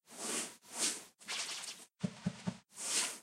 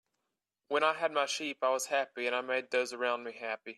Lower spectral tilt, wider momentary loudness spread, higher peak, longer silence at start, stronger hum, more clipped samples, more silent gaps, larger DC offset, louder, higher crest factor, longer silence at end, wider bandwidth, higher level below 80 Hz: about the same, -2 dB/octave vs -1 dB/octave; first, 10 LU vs 5 LU; second, -20 dBFS vs -14 dBFS; second, 0.1 s vs 0.7 s; neither; neither; neither; neither; second, -39 LUFS vs -32 LUFS; about the same, 22 dB vs 20 dB; about the same, 0 s vs 0.05 s; first, 16 kHz vs 14 kHz; first, -74 dBFS vs under -90 dBFS